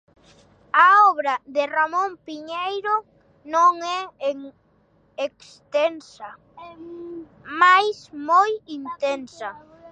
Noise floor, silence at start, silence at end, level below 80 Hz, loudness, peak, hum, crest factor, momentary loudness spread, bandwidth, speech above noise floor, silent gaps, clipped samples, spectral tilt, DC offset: -61 dBFS; 0.75 s; 0.05 s; -70 dBFS; -20 LUFS; -2 dBFS; none; 20 dB; 23 LU; 9 kHz; 37 dB; none; under 0.1%; -2.5 dB/octave; under 0.1%